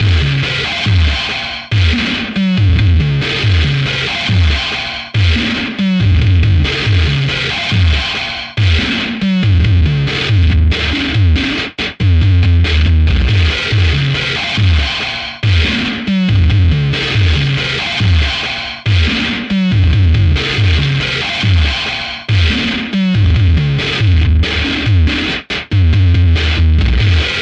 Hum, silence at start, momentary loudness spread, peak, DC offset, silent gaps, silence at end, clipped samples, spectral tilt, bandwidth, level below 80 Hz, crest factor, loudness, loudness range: none; 0 s; 5 LU; 0 dBFS; under 0.1%; none; 0 s; under 0.1%; -6 dB/octave; 8.2 kHz; -20 dBFS; 12 dB; -13 LUFS; 1 LU